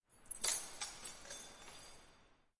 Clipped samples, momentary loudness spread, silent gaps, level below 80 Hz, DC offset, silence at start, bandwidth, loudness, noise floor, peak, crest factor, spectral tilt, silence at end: under 0.1%; 19 LU; none; -68 dBFS; under 0.1%; 0.1 s; 11.5 kHz; -43 LUFS; -68 dBFS; -22 dBFS; 26 dB; 1 dB/octave; 0.25 s